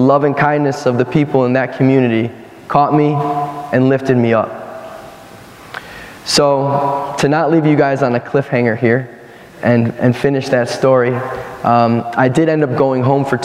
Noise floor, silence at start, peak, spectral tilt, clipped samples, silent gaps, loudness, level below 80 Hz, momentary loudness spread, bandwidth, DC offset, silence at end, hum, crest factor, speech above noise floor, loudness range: -36 dBFS; 0 s; 0 dBFS; -6.5 dB/octave; under 0.1%; none; -14 LUFS; -52 dBFS; 14 LU; 15 kHz; under 0.1%; 0 s; none; 14 dB; 23 dB; 3 LU